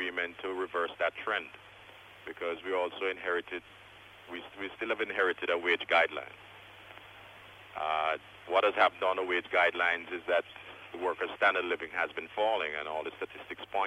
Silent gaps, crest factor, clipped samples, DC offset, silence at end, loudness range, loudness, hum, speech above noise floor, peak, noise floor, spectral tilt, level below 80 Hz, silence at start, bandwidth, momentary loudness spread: none; 20 dB; under 0.1%; under 0.1%; 0 s; 6 LU; -31 LUFS; none; 21 dB; -12 dBFS; -53 dBFS; -4 dB/octave; -72 dBFS; 0 s; 13.5 kHz; 23 LU